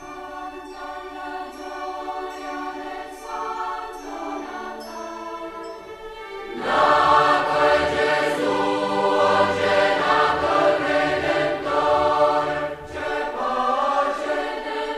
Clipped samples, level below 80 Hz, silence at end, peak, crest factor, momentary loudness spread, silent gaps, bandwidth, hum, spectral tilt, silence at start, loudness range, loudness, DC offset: under 0.1%; -50 dBFS; 0 s; -6 dBFS; 18 dB; 16 LU; none; 13.5 kHz; none; -4 dB/octave; 0 s; 13 LU; -21 LUFS; under 0.1%